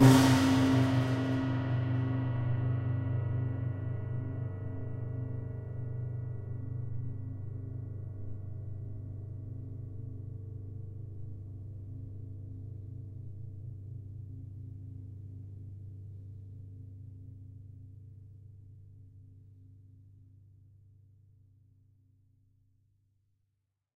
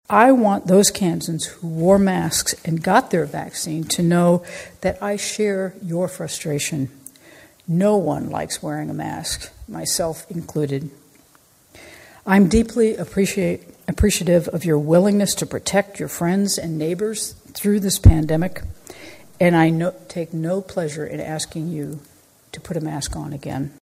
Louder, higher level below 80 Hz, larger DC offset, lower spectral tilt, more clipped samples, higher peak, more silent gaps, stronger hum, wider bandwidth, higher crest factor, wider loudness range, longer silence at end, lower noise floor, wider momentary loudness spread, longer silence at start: second, -35 LUFS vs -20 LUFS; second, -56 dBFS vs -34 dBFS; neither; first, -6.5 dB/octave vs -5 dB/octave; neither; second, -8 dBFS vs 0 dBFS; neither; first, 50 Hz at -70 dBFS vs none; about the same, 15.5 kHz vs 16 kHz; first, 26 dB vs 20 dB; first, 21 LU vs 7 LU; first, 3.65 s vs 0.15 s; first, -82 dBFS vs -54 dBFS; first, 20 LU vs 14 LU; about the same, 0 s vs 0.1 s